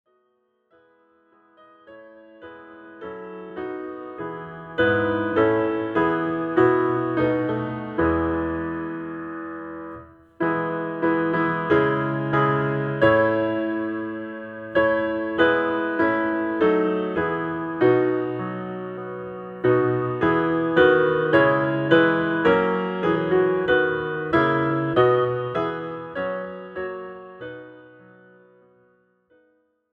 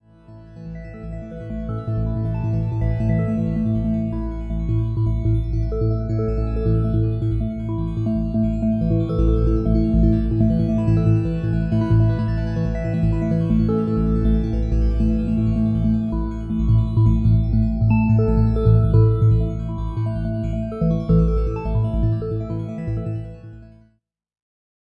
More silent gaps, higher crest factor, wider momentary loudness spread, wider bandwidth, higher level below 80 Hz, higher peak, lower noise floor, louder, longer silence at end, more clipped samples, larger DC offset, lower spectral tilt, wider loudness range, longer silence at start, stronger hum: neither; about the same, 20 dB vs 16 dB; first, 15 LU vs 9 LU; about the same, 5 kHz vs 5.2 kHz; second, -52 dBFS vs -26 dBFS; about the same, -2 dBFS vs -4 dBFS; about the same, -68 dBFS vs -65 dBFS; about the same, -22 LUFS vs -21 LUFS; first, 2.05 s vs 1.2 s; neither; neither; second, -9 dB/octave vs -11 dB/octave; first, 14 LU vs 5 LU; first, 1.9 s vs 0.3 s; neither